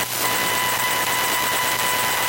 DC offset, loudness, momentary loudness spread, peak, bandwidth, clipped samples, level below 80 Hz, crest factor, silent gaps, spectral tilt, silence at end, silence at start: under 0.1%; -19 LUFS; 0 LU; -6 dBFS; 16.5 kHz; under 0.1%; -56 dBFS; 16 dB; none; -0.5 dB/octave; 0 s; 0 s